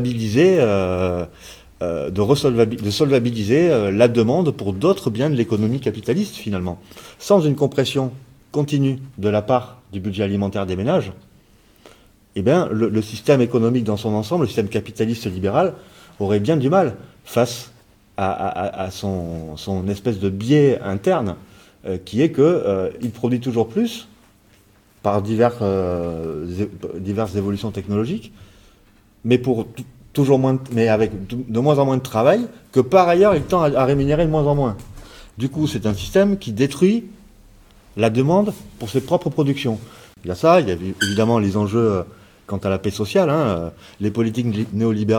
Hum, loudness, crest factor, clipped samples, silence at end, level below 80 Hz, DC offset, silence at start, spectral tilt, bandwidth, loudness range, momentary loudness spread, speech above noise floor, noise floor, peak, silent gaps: none; -19 LUFS; 18 dB; under 0.1%; 0 s; -46 dBFS; under 0.1%; 0 s; -7 dB/octave; 18 kHz; 6 LU; 12 LU; 35 dB; -53 dBFS; 0 dBFS; none